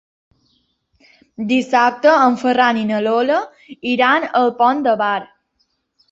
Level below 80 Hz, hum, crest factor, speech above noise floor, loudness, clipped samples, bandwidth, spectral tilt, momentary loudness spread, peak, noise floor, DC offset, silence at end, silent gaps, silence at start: -64 dBFS; none; 16 dB; 51 dB; -16 LUFS; under 0.1%; 7.8 kHz; -5 dB/octave; 9 LU; -2 dBFS; -67 dBFS; under 0.1%; 0.85 s; none; 1.4 s